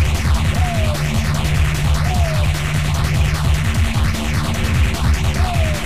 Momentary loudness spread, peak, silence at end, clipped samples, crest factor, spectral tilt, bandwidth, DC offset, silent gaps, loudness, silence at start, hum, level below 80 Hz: 2 LU; -4 dBFS; 0 s; under 0.1%; 12 dB; -5 dB/octave; 15.5 kHz; 3%; none; -18 LUFS; 0 s; none; -20 dBFS